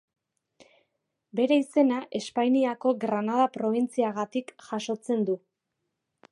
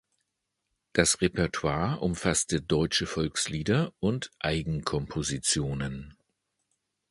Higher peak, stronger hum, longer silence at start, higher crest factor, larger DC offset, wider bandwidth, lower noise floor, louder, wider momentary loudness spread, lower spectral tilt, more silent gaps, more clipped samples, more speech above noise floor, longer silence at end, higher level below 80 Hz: second, -10 dBFS vs -6 dBFS; neither; first, 1.35 s vs 0.95 s; second, 18 dB vs 24 dB; neither; about the same, 11.5 kHz vs 11.5 kHz; about the same, -82 dBFS vs -82 dBFS; about the same, -27 LUFS vs -28 LUFS; first, 10 LU vs 6 LU; first, -5.5 dB/octave vs -4 dB/octave; neither; neither; about the same, 56 dB vs 54 dB; about the same, 0.95 s vs 1 s; second, -82 dBFS vs -48 dBFS